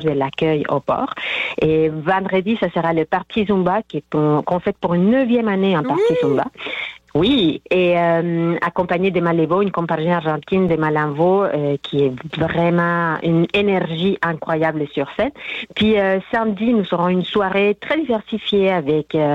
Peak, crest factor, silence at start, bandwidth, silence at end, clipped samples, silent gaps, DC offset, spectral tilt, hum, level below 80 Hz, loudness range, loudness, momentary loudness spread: -6 dBFS; 10 dB; 0 s; 7.8 kHz; 0 s; under 0.1%; none; under 0.1%; -8 dB/octave; none; -50 dBFS; 1 LU; -18 LUFS; 5 LU